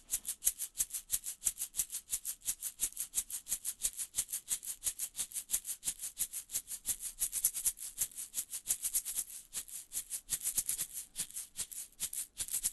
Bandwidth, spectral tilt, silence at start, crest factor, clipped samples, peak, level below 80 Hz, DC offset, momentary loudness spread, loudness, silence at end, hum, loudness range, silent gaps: 12.5 kHz; 2 dB/octave; 0.1 s; 30 dB; under 0.1%; -10 dBFS; -64 dBFS; under 0.1%; 7 LU; -36 LUFS; 0 s; none; 2 LU; none